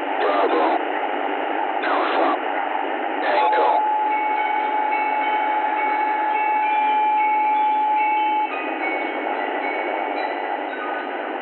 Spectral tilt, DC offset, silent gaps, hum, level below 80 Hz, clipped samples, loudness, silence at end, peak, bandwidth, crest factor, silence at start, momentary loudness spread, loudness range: 3 dB/octave; under 0.1%; none; none; under -90 dBFS; under 0.1%; -21 LUFS; 0 s; -8 dBFS; 4.3 kHz; 14 dB; 0 s; 6 LU; 2 LU